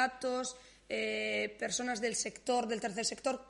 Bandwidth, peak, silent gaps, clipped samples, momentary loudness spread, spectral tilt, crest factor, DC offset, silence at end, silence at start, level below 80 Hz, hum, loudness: 11.5 kHz; -18 dBFS; none; under 0.1%; 5 LU; -2 dB/octave; 18 dB; under 0.1%; 0 s; 0 s; -70 dBFS; none; -35 LUFS